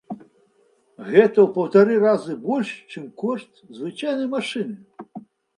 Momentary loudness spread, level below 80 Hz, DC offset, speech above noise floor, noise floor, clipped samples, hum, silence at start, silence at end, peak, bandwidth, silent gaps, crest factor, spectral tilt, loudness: 23 LU; -74 dBFS; under 0.1%; 41 dB; -61 dBFS; under 0.1%; none; 0.1 s; 0.4 s; 0 dBFS; 10.5 kHz; none; 22 dB; -6.5 dB/octave; -20 LUFS